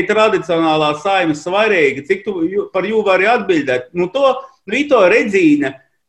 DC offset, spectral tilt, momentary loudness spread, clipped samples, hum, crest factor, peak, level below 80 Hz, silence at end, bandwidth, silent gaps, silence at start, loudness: under 0.1%; -5 dB/octave; 8 LU; under 0.1%; none; 14 dB; 0 dBFS; -56 dBFS; 0.3 s; 9.6 kHz; none; 0 s; -14 LUFS